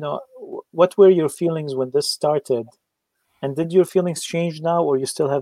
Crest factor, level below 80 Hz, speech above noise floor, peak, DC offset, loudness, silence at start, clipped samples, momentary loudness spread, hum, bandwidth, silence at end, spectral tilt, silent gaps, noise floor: 18 dB; -72 dBFS; 55 dB; -2 dBFS; under 0.1%; -20 LUFS; 0 s; under 0.1%; 17 LU; none; 15.5 kHz; 0 s; -5.5 dB/octave; none; -74 dBFS